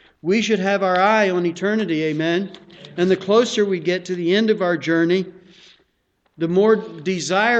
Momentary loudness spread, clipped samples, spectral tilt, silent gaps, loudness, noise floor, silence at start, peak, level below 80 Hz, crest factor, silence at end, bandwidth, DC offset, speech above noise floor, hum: 8 LU; under 0.1%; -5 dB/octave; none; -19 LUFS; -67 dBFS; 0.25 s; -4 dBFS; -64 dBFS; 16 dB; 0 s; 8.6 kHz; under 0.1%; 48 dB; none